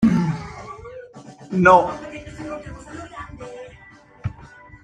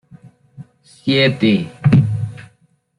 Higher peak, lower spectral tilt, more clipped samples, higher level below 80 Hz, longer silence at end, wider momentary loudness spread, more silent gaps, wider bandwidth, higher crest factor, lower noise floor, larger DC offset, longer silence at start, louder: about the same, 0 dBFS vs -2 dBFS; about the same, -7.5 dB/octave vs -7.5 dB/octave; neither; about the same, -48 dBFS vs -50 dBFS; second, 0.35 s vs 0.55 s; first, 26 LU vs 12 LU; neither; about the same, 9.8 kHz vs 10.5 kHz; first, 22 dB vs 16 dB; second, -47 dBFS vs -57 dBFS; neither; second, 0 s vs 0.6 s; second, -19 LUFS vs -16 LUFS